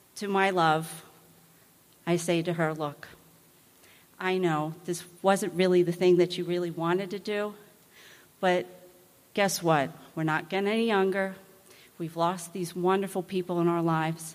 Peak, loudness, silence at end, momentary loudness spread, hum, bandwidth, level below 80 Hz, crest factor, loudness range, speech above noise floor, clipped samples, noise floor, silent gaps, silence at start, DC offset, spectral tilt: -10 dBFS; -28 LUFS; 0 s; 12 LU; none; 15.5 kHz; -74 dBFS; 20 dB; 5 LU; 32 dB; under 0.1%; -59 dBFS; none; 0.15 s; under 0.1%; -5.5 dB/octave